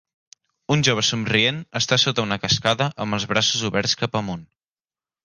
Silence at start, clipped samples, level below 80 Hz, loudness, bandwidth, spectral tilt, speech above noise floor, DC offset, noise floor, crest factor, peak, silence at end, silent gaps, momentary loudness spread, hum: 0.7 s; under 0.1%; -54 dBFS; -20 LUFS; 11 kHz; -3.5 dB/octave; over 68 dB; under 0.1%; under -90 dBFS; 20 dB; -2 dBFS; 0.8 s; none; 8 LU; none